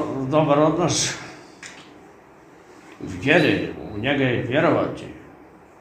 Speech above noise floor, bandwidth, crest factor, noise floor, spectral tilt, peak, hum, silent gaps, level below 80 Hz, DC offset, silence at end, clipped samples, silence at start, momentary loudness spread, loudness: 28 dB; 15 kHz; 22 dB; -48 dBFS; -4.5 dB/octave; -2 dBFS; none; none; -52 dBFS; under 0.1%; 0.4 s; under 0.1%; 0 s; 22 LU; -20 LUFS